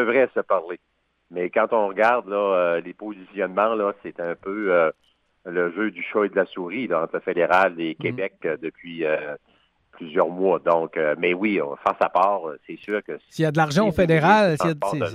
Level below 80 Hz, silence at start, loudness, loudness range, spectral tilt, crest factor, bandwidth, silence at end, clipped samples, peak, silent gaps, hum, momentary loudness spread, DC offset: -56 dBFS; 0 s; -22 LUFS; 4 LU; -6.5 dB/octave; 16 dB; 13.5 kHz; 0 s; under 0.1%; -6 dBFS; none; none; 13 LU; under 0.1%